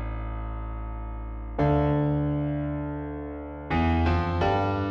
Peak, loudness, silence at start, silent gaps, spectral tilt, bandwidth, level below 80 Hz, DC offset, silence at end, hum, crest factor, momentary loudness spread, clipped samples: -12 dBFS; -28 LUFS; 0 s; none; -9 dB/octave; 6.6 kHz; -34 dBFS; under 0.1%; 0 s; none; 14 dB; 13 LU; under 0.1%